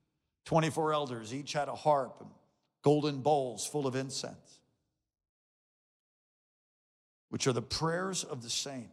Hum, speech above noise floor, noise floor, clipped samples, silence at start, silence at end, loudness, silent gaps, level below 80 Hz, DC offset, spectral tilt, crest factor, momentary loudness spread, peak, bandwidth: none; 48 dB; -81 dBFS; under 0.1%; 0.45 s; 0.05 s; -33 LUFS; 5.29-7.28 s; -68 dBFS; under 0.1%; -4.5 dB/octave; 20 dB; 9 LU; -14 dBFS; 15 kHz